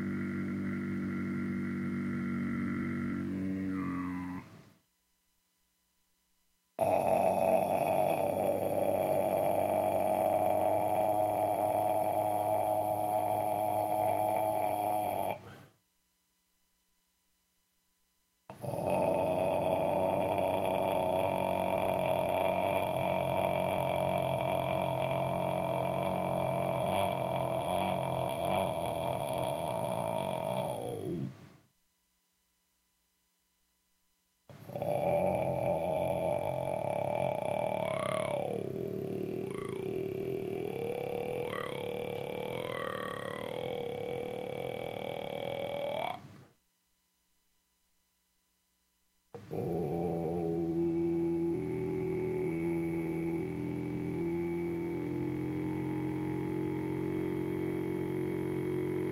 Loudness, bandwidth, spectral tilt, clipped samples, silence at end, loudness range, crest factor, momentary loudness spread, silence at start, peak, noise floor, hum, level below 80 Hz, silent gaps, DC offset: -33 LUFS; 16 kHz; -6.5 dB/octave; under 0.1%; 0 s; 10 LU; 18 dB; 8 LU; 0 s; -16 dBFS; -77 dBFS; none; -64 dBFS; none; under 0.1%